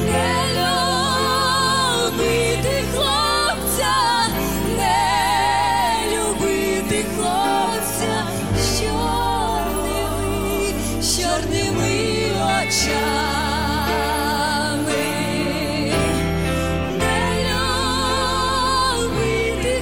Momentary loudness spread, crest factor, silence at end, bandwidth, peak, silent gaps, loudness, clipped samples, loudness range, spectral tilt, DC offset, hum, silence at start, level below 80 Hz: 4 LU; 12 dB; 0 s; 16.5 kHz; -8 dBFS; none; -19 LUFS; under 0.1%; 3 LU; -3.5 dB/octave; 0.8%; none; 0 s; -32 dBFS